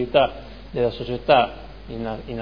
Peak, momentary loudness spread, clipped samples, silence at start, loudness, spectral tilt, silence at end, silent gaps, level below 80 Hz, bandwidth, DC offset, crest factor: -2 dBFS; 18 LU; under 0.1%; 0 s; -22 LUFS; -7.5 dB/octave; 0 s; none; -42 dBFS; 5.2 kHz; 0.4%; 20 dB